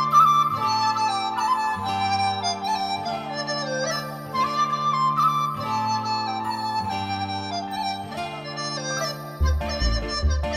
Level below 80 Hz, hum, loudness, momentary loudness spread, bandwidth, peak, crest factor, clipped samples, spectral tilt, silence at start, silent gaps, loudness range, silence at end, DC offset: -34 dBFS; none; -24 LUFS; 8 LU; 15 kHz; -6 dBFS; 18 dB; under 0.1%; -4 dB/octave; 0 s; none; 4 LU; 0 s; under 0.1%